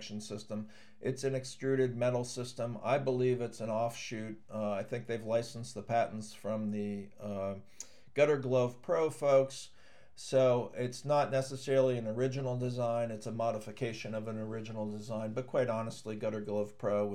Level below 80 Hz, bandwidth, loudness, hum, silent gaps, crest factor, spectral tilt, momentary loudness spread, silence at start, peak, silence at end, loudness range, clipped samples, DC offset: -76 dBFS; 13.5 kHz; -34 LUFS; none; none; 18 dB; -6 dB/octave; 13 LU; 0 s; -16 dBFS; 0 s; 5 LU; under 0.1%; 0.2%